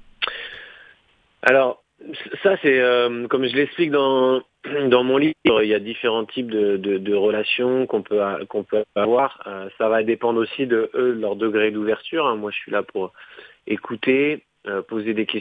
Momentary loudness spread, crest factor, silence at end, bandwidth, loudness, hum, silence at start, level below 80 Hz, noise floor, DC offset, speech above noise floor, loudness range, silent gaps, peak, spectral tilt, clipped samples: 12 LU; 20 dB; 0 s; 6 kHz; -21 LUFS; none; 0.2 s; -64 dBFS; -60 dBFS; under 0.1%; 40 dB; 4 LU; none; 0 dBFS; -7 dB/octave; under 0.1%